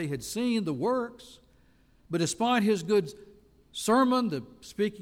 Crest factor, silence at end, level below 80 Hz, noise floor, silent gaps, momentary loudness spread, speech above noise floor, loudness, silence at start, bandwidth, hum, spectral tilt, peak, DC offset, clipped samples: 16 dB; 0 s; -64 dBFS; -62 dBFS; none; 14 LU; 34 dB; -28 LUFS; 0 s; 16.5 kHz; none; -5 dB/octave; -12 dBFS; under 0.1%; under 0.1%